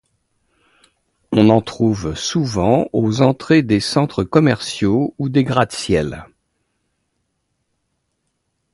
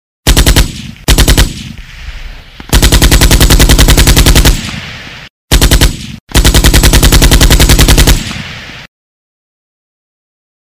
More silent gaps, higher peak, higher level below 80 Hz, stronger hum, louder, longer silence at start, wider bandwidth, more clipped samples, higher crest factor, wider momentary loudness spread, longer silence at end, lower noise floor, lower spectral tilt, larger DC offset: second, none vs 5.30-5.48 s, 6.20-6.27 s; about the same, 0 dBFS vs 0 dBFS; second, -44 dBFS vs -10 dBFS; neither; second, -17 LUFS vs -7 LUFS; first, 1.3 s vs 0.25 s; second, 11.5 kHz vs over 20 kHz; second, under 0.1% vs 6%; first, 18 dB vs 8 dB; second, 6 LU vs 19 LU; first, 2.5 s vs 1.9 s; first, -71 dBFS vs -26 dBFS; first, -6 dB/octave vs -3.5 dB/octave; neither